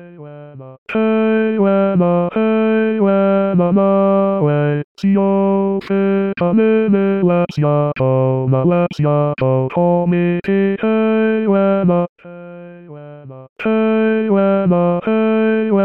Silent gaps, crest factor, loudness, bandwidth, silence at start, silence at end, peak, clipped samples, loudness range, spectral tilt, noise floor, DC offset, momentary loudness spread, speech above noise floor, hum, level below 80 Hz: 0.78-0.86 s, 4.84-4.95 s, 12.09-12.16 s, 13.49-13.56 s; 12 dB; -15 LUFS; 6 kHz; 0 s; 0 s; -4 dBFS; under 0.1%; 3 LU; -10 dB/octave; -35 dBFS; 0.3%; 11 LU; 20 dB; none; -56 dBFS